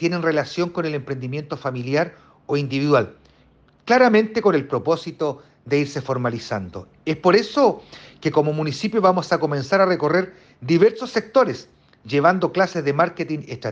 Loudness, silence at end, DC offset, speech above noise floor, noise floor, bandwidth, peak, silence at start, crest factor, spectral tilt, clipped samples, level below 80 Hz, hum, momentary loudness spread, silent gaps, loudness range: -20 LUFS; 0 s; under 0.1%; 35 dB; -55 dBFS; 7.8 kHz; -4 dBFS; 0 s; 18 dB; -6.5 dB/octave; under 0.1%; -60 dBFS; none; 11 LU; none; 3 LU